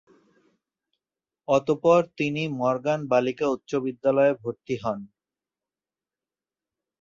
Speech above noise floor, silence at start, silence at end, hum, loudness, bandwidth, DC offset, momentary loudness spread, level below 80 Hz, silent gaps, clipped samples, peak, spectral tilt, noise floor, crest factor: over 66 dB; 1.5 s; 1.95 s; none; -24 LUFS; 7.4 kHz; under 0.1%; 11 LU; -68 dBFS; none; under 0.1%; -6 dBFS; -6.5 dB/octave; under -90 dBFS; 20 dB